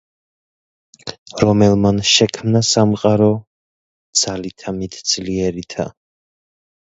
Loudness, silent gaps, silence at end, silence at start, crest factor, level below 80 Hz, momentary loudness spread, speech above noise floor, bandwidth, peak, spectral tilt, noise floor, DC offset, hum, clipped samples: -16 LUFS; 1.18-1.26 s, 3.47-4.13 s; 0.95 s; 1.05 s; 18 dB; -44 dBFS; 14 LU; over 74 dB; 8.2 kHz; 0 dBFS; -4.5 dB/octave; under -90 dBFS; under 0.1%; none; under 0.1%